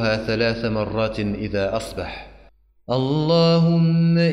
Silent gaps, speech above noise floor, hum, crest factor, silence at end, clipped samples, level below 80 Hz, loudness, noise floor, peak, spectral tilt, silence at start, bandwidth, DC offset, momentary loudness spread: none; 33 dB; none; 12 dB; 0 s; under 0.1%; -44 dBFS; -20 LUFS; -52 dBFS; -8 dBFS; -7.5 dB/octave; 0 s; 10.5 kHz; under 0.1%; 12 LU